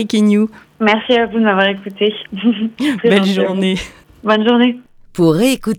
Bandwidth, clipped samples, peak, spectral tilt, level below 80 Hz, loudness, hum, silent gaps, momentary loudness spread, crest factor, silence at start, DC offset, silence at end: 16 kHz; under 0.1%; 0 dBFS; -5.5 dB/octave; -48 dBFS; -14 LUFS; none; none; 8 LU; 14 dB; 0 s; under 0.1%; 0 s